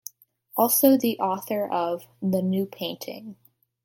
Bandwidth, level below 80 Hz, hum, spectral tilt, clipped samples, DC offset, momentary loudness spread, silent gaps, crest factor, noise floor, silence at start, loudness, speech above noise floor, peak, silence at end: 17 kHz; -72 dBFS; none; -5 dB/octave; under 0.1%; under 0.1%; 19 LU; none; 20 dB; -48 dBFS; 0.55 s; -24 LUFS; 24 dB; -6 dBFS; 0.5 s